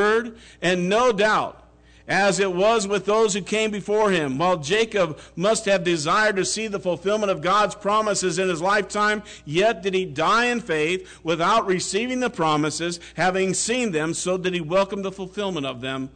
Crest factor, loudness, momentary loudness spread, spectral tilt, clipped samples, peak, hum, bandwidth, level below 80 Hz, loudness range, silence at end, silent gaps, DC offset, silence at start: 10 dB; -22 LUFS; 7 LU; -3.5 dB/octave; under 0.1%; -12 dBFS; none; 9.4 kHz; -54 dBFS; 2 LU; 0.05 s; none; under 0.1%; 0 s